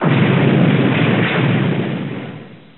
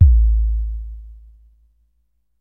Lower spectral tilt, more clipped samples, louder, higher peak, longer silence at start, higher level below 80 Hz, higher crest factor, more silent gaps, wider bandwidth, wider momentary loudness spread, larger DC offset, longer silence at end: second, -6 dB/octave vs -12.5 dB/octave; neither; first, -15 LUFS vs -19 LUFS; about the same, -2 dBFS vs 0 dBFS; about the same, 0 s vs 0 s; second, -62 dBFS vs -18 dBFS; about the same, 14 dB vs 18 dB; neither; first, 4.2 kHz vs 0.3 kHz; second, 15 LU vs 22 LU; first, 0.4% vs under 0.1%; second, 0.2 s vs 1.3 s